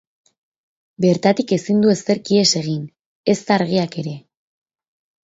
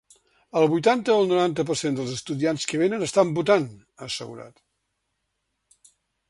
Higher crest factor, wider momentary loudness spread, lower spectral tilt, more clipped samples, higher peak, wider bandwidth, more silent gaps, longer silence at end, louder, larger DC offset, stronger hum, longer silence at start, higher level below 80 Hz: about the same, 18 dB vs 20 dB; about the same, 13 LU vs 13 LU; about the same, -5 dB/octave vs -5 dB/octave; neither; about the same, -2 dBFS vs -4 dBFS; second, 8 kHz vs 11.5 kHz; first, 2.99-3.24 s vs none; second, 1.05 s vs 1.8 s; first, -18 LUFS vs -23 LUFS; neither; neither; first, 1 s vs 0.55 s; about the same, -62 dBFS vs -64 dBFS